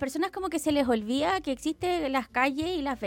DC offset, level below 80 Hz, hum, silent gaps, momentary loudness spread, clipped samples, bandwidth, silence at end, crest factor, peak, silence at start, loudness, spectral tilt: under 0.1%; -54 dBFS; none; none; 4 LU; under 0.1%; 17 kHz; 0 s; 16 dB; -12 dBFS; 0 s; -28 LUFS; -4 dB/octave